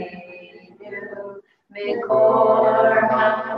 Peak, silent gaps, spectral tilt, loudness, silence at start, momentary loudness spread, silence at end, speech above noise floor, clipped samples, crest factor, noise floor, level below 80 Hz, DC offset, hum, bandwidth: -6 dBFS; none; -7.5 dB/octave; -17 LUFS; 0 s; 20 LU; 0 s; 26 dB; under 0.1%; 14 dB; -43 dBFS; -66 dBFS; under 0.1%; none; 5.4 kHz